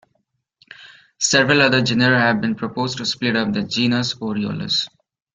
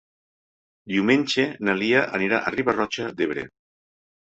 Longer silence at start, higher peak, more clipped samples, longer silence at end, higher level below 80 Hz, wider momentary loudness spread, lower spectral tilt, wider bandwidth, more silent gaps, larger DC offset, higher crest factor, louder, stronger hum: about the same, 0.8 s vs 0.85 s; first, 0 dBFS vs -4 dBFS; neither; second, 0.5 s vs 0.85 s; first, -56 dBFS vs -62 dBFS; first, 10 LU vs 7 LU; about the same, -4 dB/octave vs -5 dB/octave; first, 9.4 kHz vs 8.2 kHz; neither; neither; about the same, 20 dB vs 20 dB; first, -18 LUFS vs -23 LUFS; neither